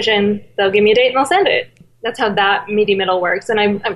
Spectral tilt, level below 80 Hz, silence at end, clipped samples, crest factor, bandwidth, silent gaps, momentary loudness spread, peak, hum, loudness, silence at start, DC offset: -4.5 dB/octave; -56 dBFS; 0 s; under 0.1%; 12 dB; 12 kHz; none; 7 LU; -2 dBFS; none; -15 LUFS; 0 s; under 0.1%